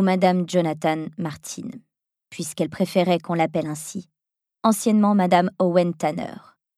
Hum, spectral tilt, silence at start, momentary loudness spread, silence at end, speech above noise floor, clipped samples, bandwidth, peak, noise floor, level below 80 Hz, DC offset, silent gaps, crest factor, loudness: none; -6 dB/octave; 0 s; 15 LU; 0.45 s; 65 dB; under 0.1%; 14.5 kHz; -2 dBFS; -87 dBFS; -68 dBFS; under 0.1%; none; 20 dB; -22 LUFS